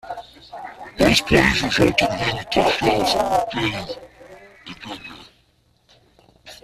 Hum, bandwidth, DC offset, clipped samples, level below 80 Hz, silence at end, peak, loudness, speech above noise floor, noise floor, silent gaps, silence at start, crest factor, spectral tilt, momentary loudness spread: none; 15 kHz; under 0.1%; under 0.1%; -42 dBFS; 0.1 s; -2 dBFS; -18 LUFS; 41 dB; -61 dBFS; none; 0.05 s; 20 dB; -4 dB/octave; 21 LU